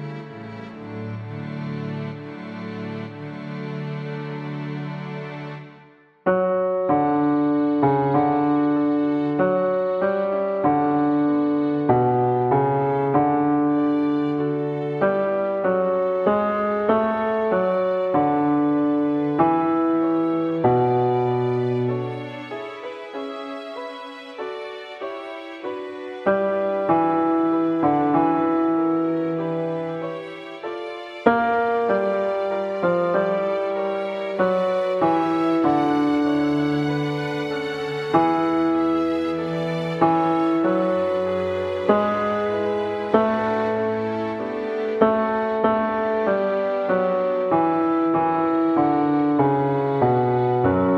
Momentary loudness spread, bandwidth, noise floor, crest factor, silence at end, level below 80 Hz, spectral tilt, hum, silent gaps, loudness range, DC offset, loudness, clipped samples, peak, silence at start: 13 LU; 7.4 kHz; -51 dBFS; 20 dB; 0 s; -60 dBFS; -8.5 dB/octave; none; none; 10 LU; under 0.1%; -21 LUFS; under 0.1%; 0 dBFS; 0 s